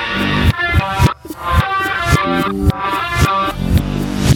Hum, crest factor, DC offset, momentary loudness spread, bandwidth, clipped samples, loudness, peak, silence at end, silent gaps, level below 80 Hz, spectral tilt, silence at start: none; 14 dB; under 0.1%; 3 LU; 18 kHz; under 0.1%; -16 LUFS; 0 dBFS; 0 s; none; -24 dBFS; -5.5 dB/octave; 0 s